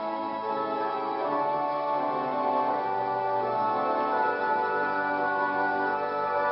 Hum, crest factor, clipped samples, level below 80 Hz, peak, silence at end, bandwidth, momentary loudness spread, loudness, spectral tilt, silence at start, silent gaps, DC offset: none; 14 dB; under 0.1%; -74 dBFS; -14 dBFS; 0 s; 5.8 kHz; 3 LU; -28 LUFS; -9 dB/octave; 0 s; none; under 0.1%